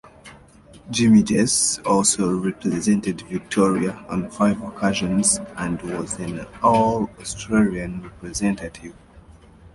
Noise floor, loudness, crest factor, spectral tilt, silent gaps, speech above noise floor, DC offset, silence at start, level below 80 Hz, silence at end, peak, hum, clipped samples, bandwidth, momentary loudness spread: -48 dBFS; -21 LUFS; 18 dB; -4.5 dB/octave; none; 27 dB; under 0.1%; 0.25 s; -48 dBFS; 0.05 s; -4 dBFS; none; under 0.1%; 11.5 kHz; 13 LU